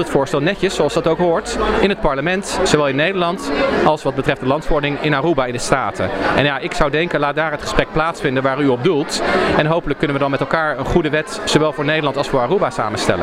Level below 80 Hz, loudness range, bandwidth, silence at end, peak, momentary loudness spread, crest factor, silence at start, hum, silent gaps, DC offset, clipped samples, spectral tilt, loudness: -34 dBFS; 1 LU; 15.5 kHz; 0 s; 0 dBFS; 4 LU; 16 dB; 0 s; none; none; under 0.1%; under 0.1%; -5 dB/octave; -17 LUFS